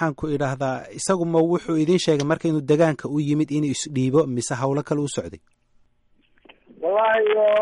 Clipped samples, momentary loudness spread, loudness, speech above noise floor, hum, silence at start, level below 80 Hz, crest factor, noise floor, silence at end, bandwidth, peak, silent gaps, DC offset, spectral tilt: under 0.1%; 8 LU; -22 LUFS; 40 dB; none; 0 s; -56 dBFS; 14 dB; -61 dBFS; 0 s; 11.5 kHz; -8 dBFS; none; under 0.1%; -5.5 dB/octave